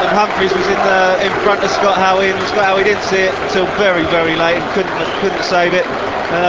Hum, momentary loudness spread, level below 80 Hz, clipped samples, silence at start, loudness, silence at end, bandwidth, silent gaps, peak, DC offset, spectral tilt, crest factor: none; 5 LU; -42 dBFS; under 0.1%; 0 s; -13 LUFS; 0 s; 8 kHz; none; 0 dBFS; 0.2%; -4 dB/octave; 14 dB